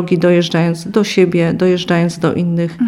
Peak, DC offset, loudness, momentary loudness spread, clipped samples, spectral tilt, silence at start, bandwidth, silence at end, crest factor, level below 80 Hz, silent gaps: 0 dBFS; under 0.1%; -14 LUFS; 4 LU; under 0.1%; -6.5 dB/octave; 0 s; 12 kHz; 0 s; 12 dB; -50 dBFS; none